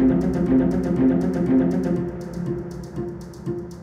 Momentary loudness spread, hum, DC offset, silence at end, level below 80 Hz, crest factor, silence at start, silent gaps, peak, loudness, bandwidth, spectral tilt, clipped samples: 12 LU; none; under 0.1%; 0 s; -40 dBFS; 14 dB; 0 s; none; -8 dBFS; -22 LUFS; 8.6 kHz; -9.5 dB/octave; under 0.1%